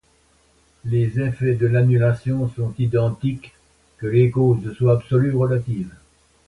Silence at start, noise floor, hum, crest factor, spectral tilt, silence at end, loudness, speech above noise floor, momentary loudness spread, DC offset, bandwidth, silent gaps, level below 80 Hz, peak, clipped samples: 0.85 s; -59 dBFS; none; 16 dB; -9.5 dB/octave; 0.5 s; -20 LUFS; 40 dB; 11 LU; under 0.1%; 4.4 kHz; none; -48 dBFS; -4 dBFS; under 0.1%